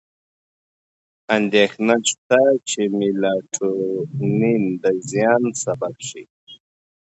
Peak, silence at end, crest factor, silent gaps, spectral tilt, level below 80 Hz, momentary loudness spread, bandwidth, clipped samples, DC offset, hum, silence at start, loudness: -2 dBFS; 0.65 s; 18 dB; 2.18-2.30 s, 6.30-6.47 s; -4.5 dB/octave; -66 dBFS; 8 LU; 8.4 kHz; under 0.1%; under 0.1%; none; 1.3 s; -19 LUFS